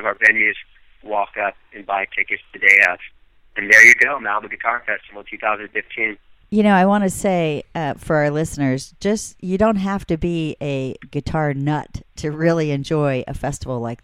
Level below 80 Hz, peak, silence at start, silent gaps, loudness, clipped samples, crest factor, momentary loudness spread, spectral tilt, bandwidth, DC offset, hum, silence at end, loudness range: -44 dBFS; 0 dBFS; 0 s; none; -17 LUFS; under 0.1%; 18 dB; 14 LU; -5 dB/octave; 16 kHz; under 0.1%; none; 0.05 s; 8 LU